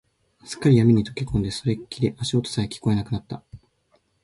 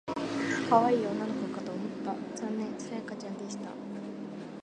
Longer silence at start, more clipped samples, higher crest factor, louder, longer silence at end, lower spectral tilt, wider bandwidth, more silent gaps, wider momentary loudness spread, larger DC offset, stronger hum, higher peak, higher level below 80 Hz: first, 0.45 s vs 0.05 s; neither; second, 18 dB vs 24 dB; first, -23 LUFS vs -33 LUFS; first, 0.65 s vs 0 s; about the same, -6.5 dB/octave vs -5.5 dB/octave; about the same, 11.5 kHz vs 10.5 kHz; neither; about the same, 14 LU vs 15 LU; neither; neither; about the same, -6 dBFS vs -8 dBFS; first, -46 dBFS vs -72 dBFS